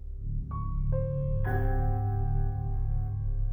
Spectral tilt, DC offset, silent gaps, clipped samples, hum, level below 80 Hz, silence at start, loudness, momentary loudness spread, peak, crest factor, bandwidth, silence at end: -11.5 dB/octave; under 0.1%; none; under 0.1%; none; -30 dBFS; 0 s; -32 LUFS; 5 LU; -18 dBFS; 12 dB; 2.2 kHz; 0 s